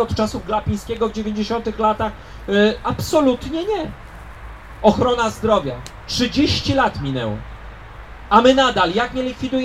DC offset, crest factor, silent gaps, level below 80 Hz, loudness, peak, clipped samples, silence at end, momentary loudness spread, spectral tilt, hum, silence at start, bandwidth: under 0.1%; 20 dB; none; -38 dBFS; -19 LUFS; 0 dBFS; under 0.1%; 0 s; 22 LU; -5 dB/octave; none; 0 s; 15.5 kHz